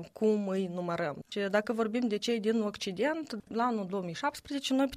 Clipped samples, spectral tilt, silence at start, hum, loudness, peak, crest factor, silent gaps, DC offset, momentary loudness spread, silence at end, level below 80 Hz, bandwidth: under 0.1%; -5 dB/octave; 0 s; none; -32 LUFS; -14 dBFS; 18 dB; none; under 0.1%; 6 LU; 0 s; -70 dBFS; 15.5 kHz